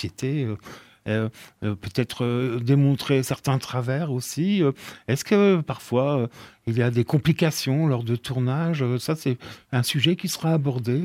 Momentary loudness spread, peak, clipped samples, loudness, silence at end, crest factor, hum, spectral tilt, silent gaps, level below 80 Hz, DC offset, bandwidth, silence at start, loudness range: 10 LU; -6 dBFS; under 0.1%; -24 LUFS; 0 s; 18 dB; none; -6 dB/octave; none; -58 dBFS; under 0.1%; 16 kHz; 0 s; 2 LU